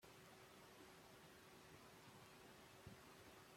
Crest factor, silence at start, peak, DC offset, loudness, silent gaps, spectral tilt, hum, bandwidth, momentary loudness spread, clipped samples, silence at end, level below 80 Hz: 18 dB; 0 s; -46 dBFS; under 0.1%; -64 LUFS; none; -3.5 dB/octave; none; 16.5 kHz; 2 LU; under 0.1%; 0 s; -82 dBFS